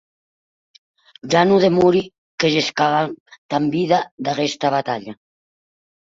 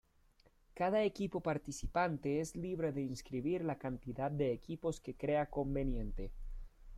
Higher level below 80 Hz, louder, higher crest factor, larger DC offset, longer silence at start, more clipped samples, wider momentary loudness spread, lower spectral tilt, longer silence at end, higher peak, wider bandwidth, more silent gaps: second, -60 dBFS vs -50 dBFS; first, -18 LUFS vs -39 LUFS; about the same, 18 dB vs 16 dB; neither; first, 1.25 s vs 0.75 s; neither; first, 14 LU vs 8 LU; about the same, -5.5 dB/octave vs -6.5 dB/octave; first, 0.95 s vs 0 s; first, -2 dBFS vs -22 dBFS; second, 7.8 kHz vs 14.5 kHz; first, 2.18-2.38 s, 3.20-3.26 s, 3.38-3.49 s, 4.11-4.18 s vs none